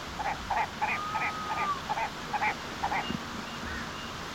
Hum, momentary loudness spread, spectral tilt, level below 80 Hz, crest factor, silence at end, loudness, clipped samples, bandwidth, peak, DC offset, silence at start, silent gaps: none; 6 LU; -3.5 dB/octave; -52 dBFS; 18 dB; 0 s; -32 LUFS; under 0.1%; 16.5 kHz; -16 dBFS; under 0.1%; 0 s; none